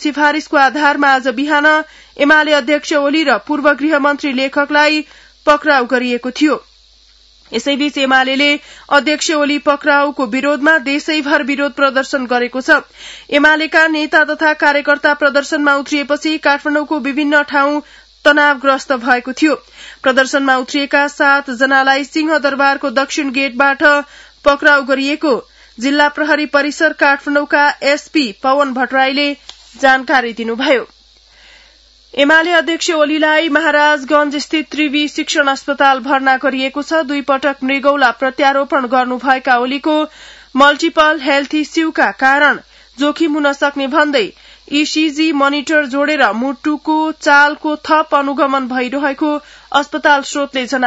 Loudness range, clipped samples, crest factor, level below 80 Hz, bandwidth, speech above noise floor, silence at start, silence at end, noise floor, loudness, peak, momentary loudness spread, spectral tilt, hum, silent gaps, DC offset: 2 LU; under 0.1%; 14 dB; -52 dBFS; 8 kHz; 34 dB; 0 s; 0 s; -47 dBFS; -13 LUFS; 0 dBFS; 7 LU; -2 dB/octave; none; none; under 0.1%